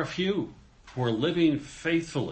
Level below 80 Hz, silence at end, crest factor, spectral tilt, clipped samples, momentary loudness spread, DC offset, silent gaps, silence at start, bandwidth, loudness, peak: -56 dBFS; 0 s; 16 dB; -6 dB/octave; under 0.1%; 10 LU; under 0.1%; none; 0 s; 8.8 kHz; -28 LUFS; -12 dBFS